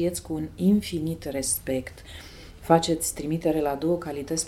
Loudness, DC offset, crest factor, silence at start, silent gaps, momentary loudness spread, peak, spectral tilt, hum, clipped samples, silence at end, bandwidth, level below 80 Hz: -26 LUFS; under 0.1%; 22 dB; 0 s; none; 19 LU; -4 dBFS; -5 dB/octave; none; under 0.1%; 0 s; 17 kHz; -48 dBFS